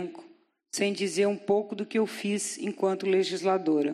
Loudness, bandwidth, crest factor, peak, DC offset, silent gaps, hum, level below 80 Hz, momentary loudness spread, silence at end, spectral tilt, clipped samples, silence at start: -28 LUFS; 13.5 kHz; 16 dB; -12 dBFS; under 0.1%; none; none; -84 dBFS; 5 LU; 0 s; -4.5 dB/octave; under 0.1%; 0 s